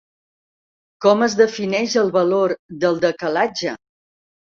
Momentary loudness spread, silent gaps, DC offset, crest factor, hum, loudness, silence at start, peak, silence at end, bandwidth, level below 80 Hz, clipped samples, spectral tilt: 6 LU; 2.59-2.69 s; under 0.1%; 18 dB; none; -19 LUFS; 1 s; -2 dBFS; 0.75 s; 7.6 kHz; -64 dBFS; under 0.1%; -4.5 dB/octave